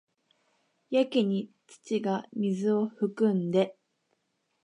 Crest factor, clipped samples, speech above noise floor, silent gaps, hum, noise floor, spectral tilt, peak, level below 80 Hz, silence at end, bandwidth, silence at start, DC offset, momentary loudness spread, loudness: 16 dB; under 0.1%; 49 dB; none; none; -76 dBFS; -7 dB/octave; -14 dBFS; -84 dBFS; 0.9 s; 10.5 kHz; 0.9 s; under 0.1%; 7 LU; -29 LUFS